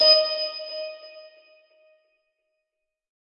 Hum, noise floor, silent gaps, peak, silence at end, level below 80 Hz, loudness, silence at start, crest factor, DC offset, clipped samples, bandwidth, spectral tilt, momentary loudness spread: none; -83 dBFS; none; -6 dBFS; 2 s; -76 dBFS; -22 LUFS; 0 s; 20 dB; under 0.1%; under 0.1%; 6.8 kHz; -1 dB/octave; 26 LU